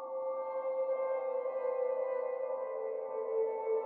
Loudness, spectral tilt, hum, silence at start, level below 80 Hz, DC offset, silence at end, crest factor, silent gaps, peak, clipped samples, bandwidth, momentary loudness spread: -36 LUFS; -3 dB/octave; none; 0 s; under -90 dBFS; under 0.1%; 0 s; 10 dB; none; -24 dBFS; under 0.1%; 2.8 kHz; 4 LU